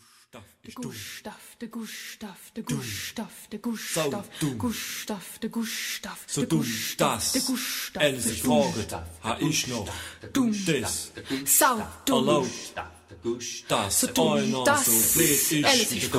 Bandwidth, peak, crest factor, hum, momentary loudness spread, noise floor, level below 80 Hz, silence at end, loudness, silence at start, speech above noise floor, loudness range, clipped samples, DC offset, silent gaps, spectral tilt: 16 kHz; -6 dBFS; 22 dB; none; 18 LU; -51 dBFS; -56 dBFS; 0 s; -25 LUFS; 0.35 s; 24 dB; 10 LU; under 0.1%; under 0.1%; none; -3 dB/octave